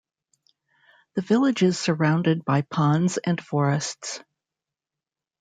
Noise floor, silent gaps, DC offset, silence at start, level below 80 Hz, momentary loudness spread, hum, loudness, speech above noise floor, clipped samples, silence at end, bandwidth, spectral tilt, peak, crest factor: -89 dBFS; none; under 0.1%; 1.15 s; -68 dBFS; 11 LU; none; -23 LUFS; 67 dB; under 0.1%; 1.2 s; 9.4 kHz; -6 dB/octave; -8 dBFS; 16 dB